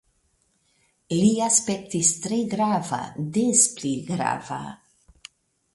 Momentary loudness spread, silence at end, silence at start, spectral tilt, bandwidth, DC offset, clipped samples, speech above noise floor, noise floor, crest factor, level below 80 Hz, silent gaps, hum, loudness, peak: 12 LU; 1 s; 1.1 s; -4 dB/octave; 11.5 kHz; under 0.1%; under 0.1%; 45 dB; -68 dBFS; 20 dB; -62 dBFS; none; none; -22 LUFS; -4 dBFS